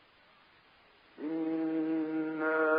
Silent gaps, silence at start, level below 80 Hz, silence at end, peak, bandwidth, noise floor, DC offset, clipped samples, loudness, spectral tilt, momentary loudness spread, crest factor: none; 1.2 s; -82 dBFS; 0 s; -18 dBFS; 5 kHz; -63 dBFS; under 0.1%; under 0.1%; -34 LUFS; -4.5 dB/octave; 7 LU; 16 dB